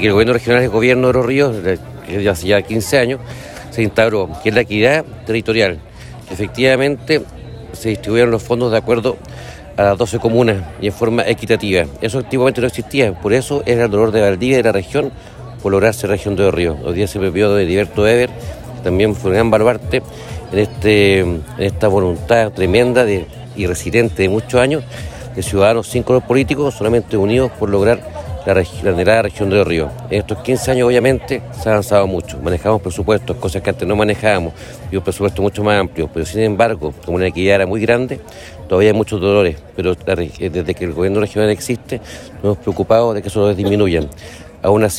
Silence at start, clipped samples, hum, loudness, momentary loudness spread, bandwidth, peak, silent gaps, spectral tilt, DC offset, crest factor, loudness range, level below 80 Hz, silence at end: 0 s; under 0.1%; none; -15 LUFS; 11 LU; 16 kHz; 0 dBFS; none; -6 dB/octave; under 0.1%; 14 dB; 2 LU; -38 dBFS; 0 s